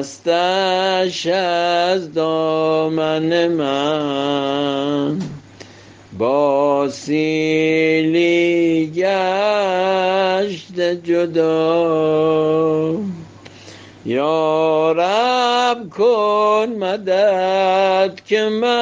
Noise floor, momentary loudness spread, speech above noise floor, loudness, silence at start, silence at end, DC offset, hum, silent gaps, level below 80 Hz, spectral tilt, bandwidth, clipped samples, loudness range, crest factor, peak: -42 dBFS; 5 LU; 26 dB; -17 LUFS; 0 s; 0 s; under 0.1%; none; none; -64 dBFS; -5.5 dB/octave; 9.4 kHz; under 0.1%; 3 LU; 12 dB; -4 dBFS